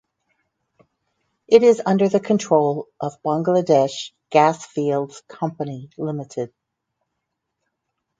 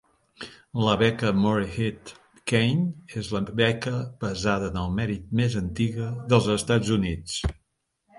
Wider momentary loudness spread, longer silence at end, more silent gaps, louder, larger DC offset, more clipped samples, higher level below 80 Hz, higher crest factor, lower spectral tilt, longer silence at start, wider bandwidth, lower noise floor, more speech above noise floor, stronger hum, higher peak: first, 15 LU vs 12 LU; first, 1.75 s vs 0.65 s; neither; first, -20 LUFS vs -25 LUFS; neither; neither; second, -68 dBFS vs -44 dBFS; about the same, 20 dB vs 22 dB; about the same, -6 dB/octave vs -6 dB/octave; first, 1.5 s vs 0.4 s; second, 8.6 kHz vs 11.5 kHz; about the same, -78 dBFS vs -75 dBFS; first, 59 dB vs 50 dB; neither; first, 0 dBFS vs -4 dBFS